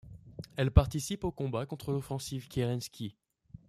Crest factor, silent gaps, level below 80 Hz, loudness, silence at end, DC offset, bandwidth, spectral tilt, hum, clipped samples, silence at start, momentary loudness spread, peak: 24 dB; none; -40 dBFS; -33 LUFS; 0.55 s; under 0.1%; 15 kHz; -6 dB/octave; none; under 0.1%; 0.05 s; 17 LU; -8 dBFS